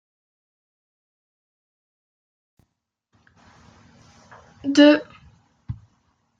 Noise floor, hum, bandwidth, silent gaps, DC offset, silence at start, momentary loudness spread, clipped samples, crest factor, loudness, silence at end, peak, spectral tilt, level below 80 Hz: -77 dBFS; none; 7.8 kHz; none; under 0.1%; 4.65 s; 24 LU; under 0.1%; 24 dB; -17 LUFS; 0.65 s; -2 dBFS; -5 dB/octave; -58 dBFS